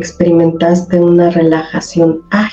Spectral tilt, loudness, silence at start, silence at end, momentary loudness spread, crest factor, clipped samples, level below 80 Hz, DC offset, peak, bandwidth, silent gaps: -7 dB/octave; -11 LUFS; 0 s; 0 s; 5 LU; 10 dB; under 0.1%; -44 dBFS; under 0.1%; 0 dBFS; 8 kHz; none